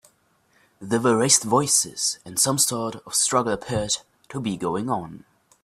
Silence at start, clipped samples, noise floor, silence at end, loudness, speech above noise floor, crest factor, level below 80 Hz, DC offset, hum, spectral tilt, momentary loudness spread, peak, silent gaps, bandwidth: 0.8 s; under 0.1%; -63 dBFS; 0.45 s; -22 LUFS; 40 dB; 22 dB; -58 dBFS; under 0.1%; none; -3 dB/octave; 12 LU; -2 dBFS; none; 15.5 kHz